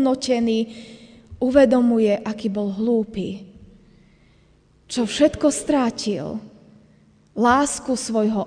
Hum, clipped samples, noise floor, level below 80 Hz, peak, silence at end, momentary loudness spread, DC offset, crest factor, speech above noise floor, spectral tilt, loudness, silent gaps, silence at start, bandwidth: none; under 0.1%; -56 dBFS; -50 dBFS; -2 dBFS; 0 s; 14 LU; under 0.1%; 20 dB; 36 dB; -4.5 dB/octave; -20 LUFS; none; 0 s; 10 kHz